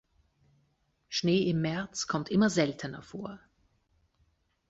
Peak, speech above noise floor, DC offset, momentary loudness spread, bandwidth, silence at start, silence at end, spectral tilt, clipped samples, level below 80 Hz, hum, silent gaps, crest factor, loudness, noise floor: -12 dBFS; 44 dB; under 0.1%; 15 LU; 8 kHz; 1.1 s; 1.35 s; -5 dB/octave; under 0.1%; -64 dBFS; none; none; 20 dB; -30 LUFS; -73 dBFS